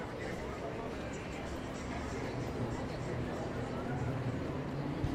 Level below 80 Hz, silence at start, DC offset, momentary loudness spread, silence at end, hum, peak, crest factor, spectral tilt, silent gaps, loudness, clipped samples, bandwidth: -50 dBFS; 0 s; under 0.1%; 4 LU; 0 s; none; -22 dBFS; 16 dB; -6.5 dB/octave; none; -39 LUFS; under 0.1%; 15 kHz